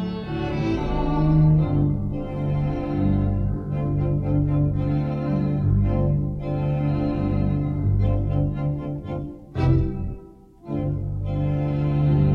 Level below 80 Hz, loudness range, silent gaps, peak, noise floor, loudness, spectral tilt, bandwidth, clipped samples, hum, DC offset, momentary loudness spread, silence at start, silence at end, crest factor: -32 dBFS; 3 LU; none; -6 dBFS; -45 dBFS; -23 LUFS; -10.5 dB/octave; 5.4 kHz; under 0.1%; none; under 0.1%; 8 LU; 0 s; 0 s; 16 dB